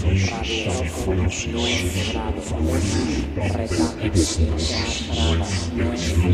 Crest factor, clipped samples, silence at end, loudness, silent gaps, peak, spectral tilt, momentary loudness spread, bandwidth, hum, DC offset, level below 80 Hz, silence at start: 16 dB; under 0.1%; 0 s; -22 LUFS; none; -4 dBFS; -5 dB/octave; 4 LU; 13.5 kHz; none; under 0.1%; -28 dBFS; 0 s